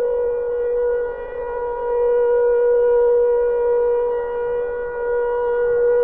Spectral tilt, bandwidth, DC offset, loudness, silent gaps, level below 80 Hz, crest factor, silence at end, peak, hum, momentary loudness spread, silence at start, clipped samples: -8.5 dB/octave; 3 kHz; 0.5%; -19 LUFS; none; -44 dBFS; 8 dB; 0 s; -10 dBFS; none; 9 LU; 0 s; under 0.1%